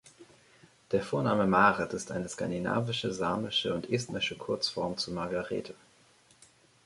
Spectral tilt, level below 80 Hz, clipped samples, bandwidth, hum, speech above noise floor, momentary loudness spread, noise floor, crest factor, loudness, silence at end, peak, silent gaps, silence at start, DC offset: -4.5 dB/octave; -62 dBFS; under 0.1%; 11.5 kHz; none; 32 dB; 10 LU; -63 dBFS; 22 dB; -30 LUFS; 1.1 s; -10 dBFS; none; 0.05 s; under 0.1%